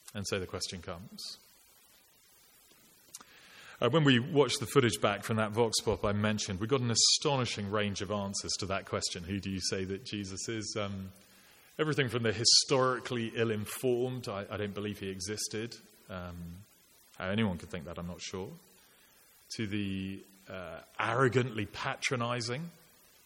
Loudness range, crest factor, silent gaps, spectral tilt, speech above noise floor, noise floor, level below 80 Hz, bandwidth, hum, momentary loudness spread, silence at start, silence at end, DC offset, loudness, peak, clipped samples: 10 LU; 22 dB; none; -3.5 dB/octave; 30 dB; -63 dBFS; -62 dBFS; 17 kHz; none; 18 LU; 0.05 s; 0.55 s; under 0.1%; -32 LUFS; -10 dBFS; under 0.1%